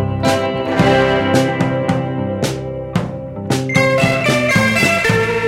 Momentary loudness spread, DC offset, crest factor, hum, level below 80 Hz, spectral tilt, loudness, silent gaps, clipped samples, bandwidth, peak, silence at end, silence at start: 9 LU; under 0.1%; 16 dB; none; -40 dBFS; -5.5 dB/octave; -15 LUFS; none; under 0.1%; 16.5 kHz; 0 dBFS; 0 s; 0 s